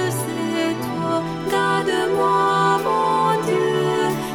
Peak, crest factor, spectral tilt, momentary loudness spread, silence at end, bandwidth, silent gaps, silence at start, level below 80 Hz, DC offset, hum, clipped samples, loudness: -6 dBFS; 12 dB; -5 dB/octave; 6 LU; 0 s; 19 kHz; none; 0 s; -54 dBFS; under 0.1%; none; under 0.1%; -20 LUFS